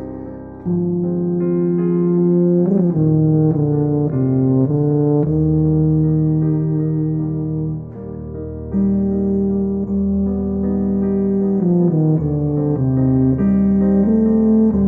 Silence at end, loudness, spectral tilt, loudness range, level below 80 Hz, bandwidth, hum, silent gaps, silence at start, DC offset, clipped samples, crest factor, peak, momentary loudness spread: 0 s; -17 LUFS; -14.5 dB/octave; 4 LU; -38 dBFS; 2.3 kHz; none; none; 0 s; under 0.1%; under 0.1%; 12 dB; -4 dBFS; 8 LU